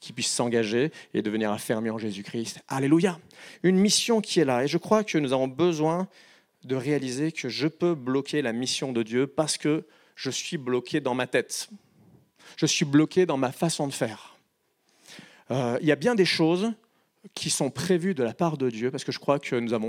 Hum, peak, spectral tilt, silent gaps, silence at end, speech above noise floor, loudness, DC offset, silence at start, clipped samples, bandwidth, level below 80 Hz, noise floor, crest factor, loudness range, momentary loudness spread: none; -6 dBFS; -4.5 dB/octave; none; 0 s; 45 dB; -26 LUFS; under 0.1%; 0 s; under 0.1%; 16 kHz; -72 dBFS; -71 dBFS; 20 dB; 4 LU; 10 LU